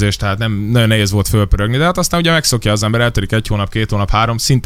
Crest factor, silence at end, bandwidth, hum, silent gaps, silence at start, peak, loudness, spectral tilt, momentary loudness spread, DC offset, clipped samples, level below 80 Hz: 14 dB; 0 s; 16 kHz; none; none; 0 s; 0 dBFS; -14 LUFS; -4.5 dB/octave; 5 LU; under 0.1%; under 0.1%; -24 dBFS